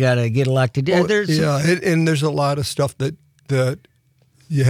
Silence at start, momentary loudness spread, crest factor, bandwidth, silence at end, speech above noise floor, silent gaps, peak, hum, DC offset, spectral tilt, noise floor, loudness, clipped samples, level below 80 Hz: 0 s; 7 LU; 12 dB; 15 kHz; 0 s; 40 dB; none; -6 dBFS; none; under 0.1%; -6 dB/octave; -58 dBFS; -19 LUFS; under 0.1%; -56 dBFS